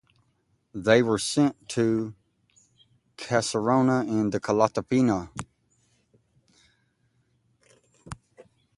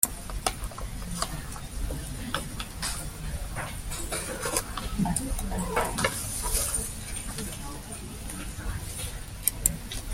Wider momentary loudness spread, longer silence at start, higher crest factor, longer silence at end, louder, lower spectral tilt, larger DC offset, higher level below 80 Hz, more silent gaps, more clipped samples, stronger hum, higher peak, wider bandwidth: first, 21 LU vs 11 LU; first, 0.75 s vs 0 s; second, 22 dB vs 30 dB; first, 0.65 s vs 0 s; first, -24 LUFS vs -31 LUFS; first, -5.5 dB/octave vs -3 dB/octave; neither; second, -58 dBFS vs -38 dBFS; neither; neither; neither; second, -6 dBFS vs -2 dBFS; second, 11.5 kHz vs 16.5 kHz